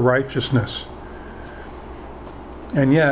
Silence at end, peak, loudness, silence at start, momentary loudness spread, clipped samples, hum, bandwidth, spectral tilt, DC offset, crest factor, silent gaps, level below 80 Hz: 0 s; -4 dBFS; -21 LUFS; 0 s; 19 LU; under 0.1%; none; 4 kHz; -11 dB/octave; under 0.1%; 18 dB; none; -42 dBFS